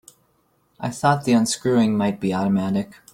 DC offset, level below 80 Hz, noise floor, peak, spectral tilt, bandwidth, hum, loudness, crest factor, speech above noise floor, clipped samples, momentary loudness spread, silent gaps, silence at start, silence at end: under 0.1%; -58 dBFS; -64 dBFS; -4 dBFS; -5.5 dB/octave; 16 kHz; none; -21 LUFS; 18 dB; 44 dB; under 0.1%; 8 LU; none; 0.8 s; 0.2 s